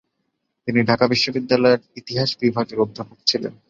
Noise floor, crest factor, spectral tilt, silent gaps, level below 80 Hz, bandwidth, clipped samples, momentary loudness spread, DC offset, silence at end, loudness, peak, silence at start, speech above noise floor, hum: -74 dBFS; 20 dB; -5 dB/octave; none; -56 dBFS; 7.6 kHz; under 0.1%; 7 LU; under 0.1%; 0.15 s; -20 LUFS; 0 dBFS; 0.65 s; 54 dB; none